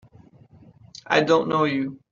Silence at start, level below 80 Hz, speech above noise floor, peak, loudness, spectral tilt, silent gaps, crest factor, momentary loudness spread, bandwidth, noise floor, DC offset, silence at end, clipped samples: 1.1 s; -66 dBFS; 30 dB; -4 dBFS; -21 LUFS; -3.5 dB/octave; none; 22 dB; 6 LU; 7.6 kHz; -51 dBFS; under 0.1%; 0.15 s; under 0.1%